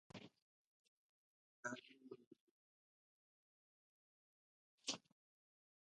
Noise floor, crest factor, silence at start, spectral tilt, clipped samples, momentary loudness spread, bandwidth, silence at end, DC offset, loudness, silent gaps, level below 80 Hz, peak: under -90 dBFS; 30 dB; 0.15 s; -2 dB/octave; under 0.1%; 14 LU; 9.4 kHz; 0.95 s; under 0.1%; -53 LUFS; 0.42-1.63 s, 2.27-2.31 s, 2.41-4.78 s; under -90 dBFS; -30 dBFS